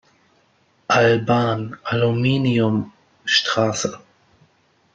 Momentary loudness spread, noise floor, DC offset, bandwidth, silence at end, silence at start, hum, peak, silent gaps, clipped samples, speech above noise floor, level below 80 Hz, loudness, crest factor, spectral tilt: 11 LU; -60 dBFS; under 0.1%; 7.8 kHz; 1 s; 0.9 s; none; -2 dBFS; none; under 0.1%; 42 dB; -56 dBFS; -19 LUFS; 18 dB; -5 dB/octave